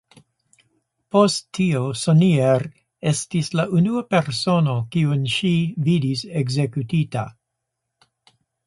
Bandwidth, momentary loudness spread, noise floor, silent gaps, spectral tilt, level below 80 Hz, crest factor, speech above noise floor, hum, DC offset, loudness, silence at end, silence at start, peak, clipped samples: 11.5 kHz; 7 LU; -79 dBFS; none; -6 dB/octave; -58 dBFS; 18 dB; 60 dB; none; under 0.1%; -20 LUFS; 1.35 s; 1.15 s; -2 dBFS; under 0.1%